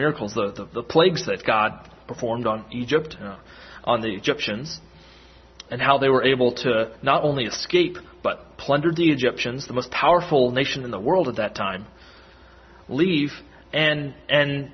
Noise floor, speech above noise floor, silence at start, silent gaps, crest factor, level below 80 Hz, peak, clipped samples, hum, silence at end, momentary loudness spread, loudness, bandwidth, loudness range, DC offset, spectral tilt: -49 dBFS; 27 dB; 0 s; none; 20 dB; -54 dBFS; -2 dBFS; under 0.1%; none; 0.05 s; 13 LU; -22 LUFS; 6.4 kHz; 5 LU; under 0.1%; -5.5 dB/octave